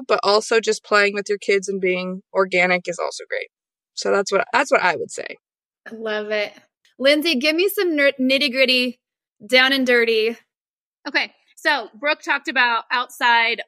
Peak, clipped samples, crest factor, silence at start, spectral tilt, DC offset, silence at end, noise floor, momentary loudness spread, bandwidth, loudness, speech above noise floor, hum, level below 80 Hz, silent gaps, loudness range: -2 dBFS; under 0.1%; 18 dB; 0 s; -3 dB/octave; under 0.1%; 0.05 s; under -90 dBFS; 12 LU; 15.5 kHz; -19 LUFS; over 70 dB; none; -82 dBFS; 10.61-10.92 s, 10.99-11.03 s; 5 LU